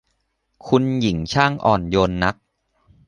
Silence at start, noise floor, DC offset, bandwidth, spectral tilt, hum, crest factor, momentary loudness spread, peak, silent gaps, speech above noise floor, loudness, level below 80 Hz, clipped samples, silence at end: 0.65 s; -70 dBFS; under 0.1%; 10.5 kHz; -6 dB/octave; none; 20 dB; 4 LU; -2 dBFS; none; 52 dB; -19 LUFS; -42 dBFS; under 0.1%; 0.75 s